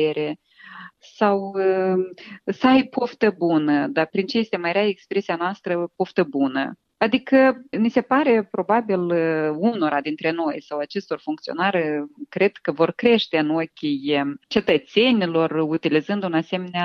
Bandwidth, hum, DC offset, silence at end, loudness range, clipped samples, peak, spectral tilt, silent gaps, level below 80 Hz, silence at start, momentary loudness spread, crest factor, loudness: 6.6 kHz; none; under 0.1%; 0 s; 3 LU; under 0.1%; -4 dBFS; -7 dB/octave; none; -64 dBFS; 0 s; 10 LU; 18 dB; -21 LUFS